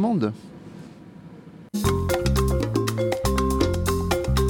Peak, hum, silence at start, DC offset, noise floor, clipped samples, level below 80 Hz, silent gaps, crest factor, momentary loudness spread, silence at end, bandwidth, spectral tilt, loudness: -8 dBFS; none; 0 s; under 0.1%; -43 dBFS; under 0.1%; -30 dBFS; none; 14 dB; 21 LU; 0 s; 19 kHz; -6 dB/octave; -24 LUFS